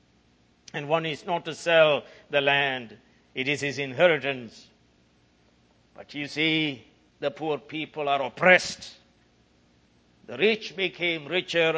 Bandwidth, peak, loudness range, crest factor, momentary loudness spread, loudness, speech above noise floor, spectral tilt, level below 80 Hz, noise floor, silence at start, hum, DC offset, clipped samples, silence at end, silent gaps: 8 kHz; -2 dBFS; 6 LU; 24 dB; 17 LU; -25 LUFS; 37 dB; -4 dB/octave; -68 dBFS; -63 dBFS; 0.75 s; none; under 0.1%; under 0.1%; 0 s; none